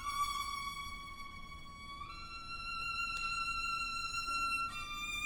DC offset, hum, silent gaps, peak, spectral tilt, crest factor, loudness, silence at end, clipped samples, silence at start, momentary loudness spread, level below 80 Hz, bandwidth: under 0.1%; none; none; -26 dBFS; -1 dB/octave; 14 dB; -38 LUFS; 0 s; under 0.1%; 0 s; 13 LU; -54 dBFS; 17 kHz